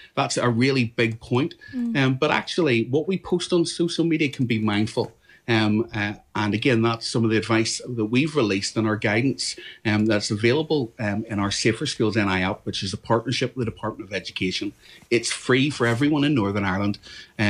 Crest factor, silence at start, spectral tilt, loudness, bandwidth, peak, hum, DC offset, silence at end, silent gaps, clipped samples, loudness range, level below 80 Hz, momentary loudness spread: 16 dB; 0 s; -5 dB/octave; -23 LUFS; 11 kHz; -8 dBFS; none; under 0.1%; 0 s; none; under 0.1%; 2 LU; -56 dBFS; 8 LU